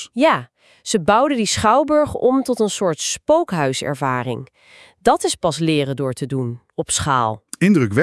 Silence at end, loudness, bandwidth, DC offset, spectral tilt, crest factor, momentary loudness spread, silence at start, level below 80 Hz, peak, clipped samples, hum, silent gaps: 0 s; -18 LUFS; 12 kHz; under 0.1%; -4.5 dB/octave; 18 dB; 8 LU; 0 s; -50 dBFS; -2 dBFS; under 0.1%; none; none